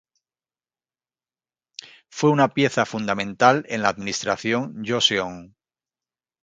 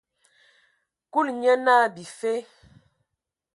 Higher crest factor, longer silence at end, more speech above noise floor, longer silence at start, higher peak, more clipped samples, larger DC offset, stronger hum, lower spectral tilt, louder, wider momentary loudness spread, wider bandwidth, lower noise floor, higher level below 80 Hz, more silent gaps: about the same, 22 dB vs 20 dB; second, 1 s vs 1.15 s; first, over 68 dB vs 62 dB; first, 1.8 s vs 1.15 s; first, -2 dBFS vs -6 dBFS; neither; neither; neither; about the same, -4 dB/octave vs -4 dB/octave; about the same, -21 LUFS vs -23 LUFS; first, 22 LU vs 12 LU; second, 9.4 kHz vs 11.5 kHz; first, under -90 dBFS vs -84 dBFS; first, -62 dBFS vs -72 dBFS; neither